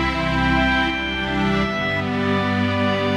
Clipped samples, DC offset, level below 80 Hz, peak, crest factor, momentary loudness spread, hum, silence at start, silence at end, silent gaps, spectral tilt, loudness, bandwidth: under 0.1%; under 0.1%; -34 dBFS; -8 dBFS; 12 dB; 4 LU; none; 0 s; 0 s; none; -6 dB/octave; -20 LUFS; 12 kHz